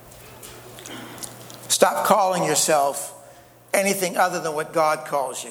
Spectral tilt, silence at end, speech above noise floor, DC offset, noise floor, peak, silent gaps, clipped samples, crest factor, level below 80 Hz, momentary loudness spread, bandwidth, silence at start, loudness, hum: -2.5 dB/octave; 0 s; 27 dB; under 0.1%; -48 dBFS; 0 dBFS; none; under 0.1%; 22 dB; -64 dBFS; 21 LU; over 20 kHz; 0.05 s; -21 LUFS; none